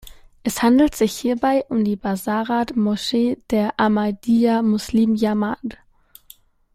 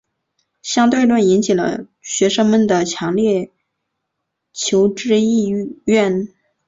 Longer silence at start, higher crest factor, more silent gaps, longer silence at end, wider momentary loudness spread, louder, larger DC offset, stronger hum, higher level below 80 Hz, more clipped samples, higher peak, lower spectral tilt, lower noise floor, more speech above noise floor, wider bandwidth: second, 0.05 s vs 0.65 s; about the same, 16 dB vs 16 dB; neither; first, 1 s vs 0.4 s; second, 7 LU vs 10 LU; second, -20 LUFS vs -16 LUFS; neither; neither; first, -48 dBFS vs -58 dBFS; neither; about the same, -4 dBFS vs -2 dBFS; about the same, -5.5 dB/octave vs -4.5 dB/octave; second, -50 dBFS vs -76 dBFS; second, 31 dB vs 61 dB; first, 16 kHz vs 7.8 kHz